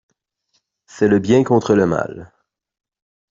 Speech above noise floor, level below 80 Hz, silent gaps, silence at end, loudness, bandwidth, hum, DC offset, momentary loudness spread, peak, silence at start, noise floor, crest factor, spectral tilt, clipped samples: 53 dB; -54 dBFS; none; 1.1 s; -16 LUFS; 7.6 kHz; none; under 0.1%; 12 LU; -2 dBFS; 0.95 s; -68 dBFS; 16 dB; -7 dB/octave; under 0.1%